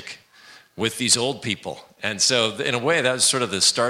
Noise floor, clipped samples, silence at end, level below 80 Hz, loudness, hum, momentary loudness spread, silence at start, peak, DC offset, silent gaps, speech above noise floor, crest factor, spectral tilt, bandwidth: -49 dBFS; under 0.1%; 0 s; -64 dBFS; -20 LUFS; none; 11 LU; 0 s; -4 dBFS; under 0.1%; none; 27 dB; 20 dB; -1.5 dB/octave; 16 kHz